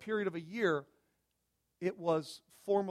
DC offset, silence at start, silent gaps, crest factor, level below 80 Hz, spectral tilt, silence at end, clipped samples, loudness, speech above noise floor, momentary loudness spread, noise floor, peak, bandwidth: under 0.1%; 0 s; none; 18 dB; -80 dBFS; -6 dB/octave; 0 s; under 0.1%; -36 LUFS; 47 dB; 8 LU; -82 dBFS; -18 dBFS; 14 kHz